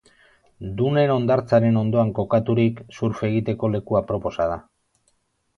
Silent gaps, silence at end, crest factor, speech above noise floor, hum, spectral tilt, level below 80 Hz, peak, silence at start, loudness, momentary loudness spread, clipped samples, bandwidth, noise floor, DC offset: none; 0.95 s; 16 dB; 47 dB; none; -9 dB/octave; -50 dBFS; -6 dBFS; 0.6 s; -21 LUFS; 9 LU; under 0.1%; 6.6 kHz; -68 dBFS; under 0.1%